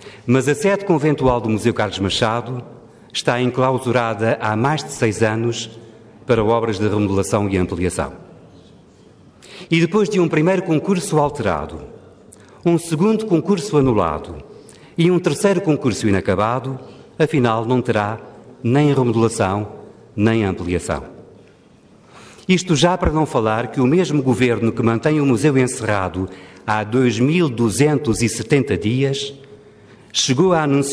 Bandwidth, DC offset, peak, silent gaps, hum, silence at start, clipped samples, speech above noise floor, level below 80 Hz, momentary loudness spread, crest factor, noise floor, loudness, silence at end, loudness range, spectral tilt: 11 kHz; under 0.1%; -2 dBFS; none; none; 0 s; under 0.1%; 31 dB; -42 dBFS; 11 LU; 16 dB; -49 dBFS; -18 LUFS; 0 s; 3 LU; -5.5 dB/octave